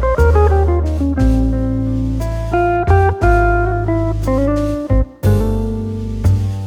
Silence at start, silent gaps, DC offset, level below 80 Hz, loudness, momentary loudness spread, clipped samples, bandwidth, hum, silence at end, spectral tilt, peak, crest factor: 0 s; none; under 0.1%; -18 dBFS; -16 LUFS; 6 LU; under 0.1%; 15 kHz; none; 0 s; -8.5 dB/octave; 0 dBFS; 14 dB